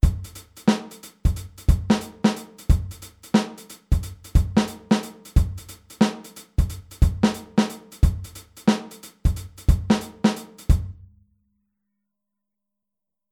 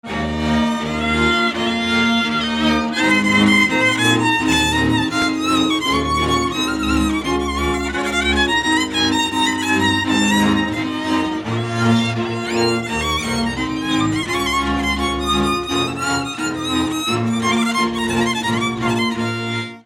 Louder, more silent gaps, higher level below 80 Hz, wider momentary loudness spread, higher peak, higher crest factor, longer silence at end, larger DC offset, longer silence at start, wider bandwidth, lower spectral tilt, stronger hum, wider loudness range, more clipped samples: second, -24 LUFS vs -17 LUFS; neither; first, -28 dBFS vs -34 dBFS; first, 15 LU vs 6 LU; about the same, -4 dBFS vs -2 dBFS; about the same, 20 dB vs 16 dB; first, 2.4 s vs 0.05 s; neither; about the same, 0.05 s vs 0.05 s; about the same, 17.5 kHz vs 17 kHz; first, -6.5 dB/octave vs -4 dB/octave; neither; about the same, 2 LU vs 4 LU; neither